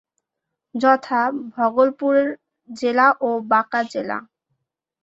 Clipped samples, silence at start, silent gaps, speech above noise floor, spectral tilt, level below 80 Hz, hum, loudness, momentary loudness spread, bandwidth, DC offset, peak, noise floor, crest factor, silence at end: under 0.1%; 0.75 s; none; 63 dB; -5 dB/octave; -70 dBFS; none; -19 LUFS; 13 LU; 8 kHz; under 0.1%; -2 dBFS; -82 dBFS; 18 dB; 0.8 s